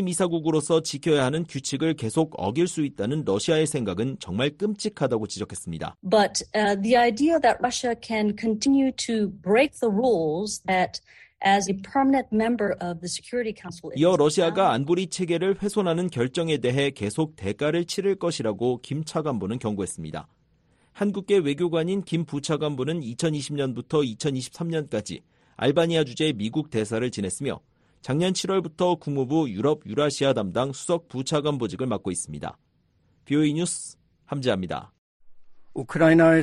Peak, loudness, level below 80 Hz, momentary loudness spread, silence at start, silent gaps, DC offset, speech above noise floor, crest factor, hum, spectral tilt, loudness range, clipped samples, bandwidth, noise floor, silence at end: -6 dBFS; -25 LUFS; -58 dBFS; 9 LU; 0 s; 34.98-35.20 s; under 0.1%; 41 dB; 18 dB; none; -5 dB/octave; 5 LU; under 0.1%; 12 kHz; -65 dBFS; 0 s